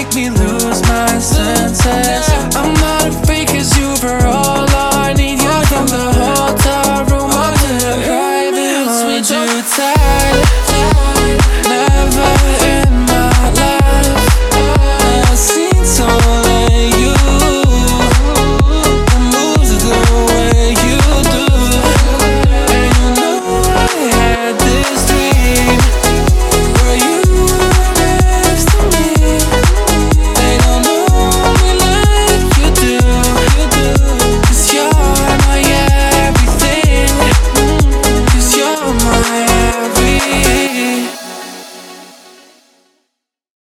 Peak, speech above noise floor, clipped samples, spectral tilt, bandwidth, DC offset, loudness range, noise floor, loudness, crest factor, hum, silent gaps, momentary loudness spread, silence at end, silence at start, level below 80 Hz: 0 dBFS; 60 dB; under 0.1%; -4 dB/octave; 16 kHz; under 0.1%; 2 LU; -71 dBFS; -11 LUFS; 10 dB; none; none; 3 LU; 1.6 s; 0 s; -14 dBFS